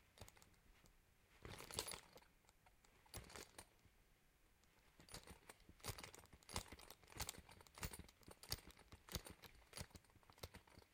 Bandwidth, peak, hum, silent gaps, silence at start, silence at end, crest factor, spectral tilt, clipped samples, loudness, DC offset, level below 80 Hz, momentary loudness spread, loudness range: 16.5 kHz; -24 dBFS; none; none; 0 s; 0 s; 34 dB; -2.5 dB/octave; under 0.1%; -56 LUFS; under 0.1%; -68 dBFS; 13 LU; 8 LU